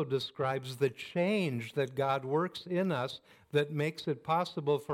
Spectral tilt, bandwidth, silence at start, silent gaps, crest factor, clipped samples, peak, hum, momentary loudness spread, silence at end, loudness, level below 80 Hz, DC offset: -6.5 dB/octave; 16 kHz; 0 s; none; 16 dB; under 0.1%; -16 dBFS; none; 4 LU; 0 s; -33 LUFS; -76 dBFS; under 0.1%